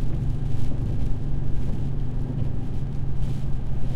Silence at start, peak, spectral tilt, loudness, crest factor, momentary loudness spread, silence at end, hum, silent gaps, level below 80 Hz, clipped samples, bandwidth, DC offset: 0 s; -10 dBFS; -9 dB/octave; -29 LUFS; 10 dB; 2 LU; 0 s; none; none; -28 dBFS; under 0.1%; 4.5 kHz; under 0.1%